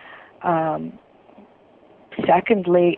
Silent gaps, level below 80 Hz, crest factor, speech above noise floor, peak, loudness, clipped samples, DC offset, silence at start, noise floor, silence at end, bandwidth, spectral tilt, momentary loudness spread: none; -60 dBFS; 18 dB; 33 dB; -4 dBFS; -20 LUFS; under 0.1%; under 0.1%; 0.05 s; -52 dBFS; 0 s; 4.1 kHz; -10.5 dB/octave; 18 LU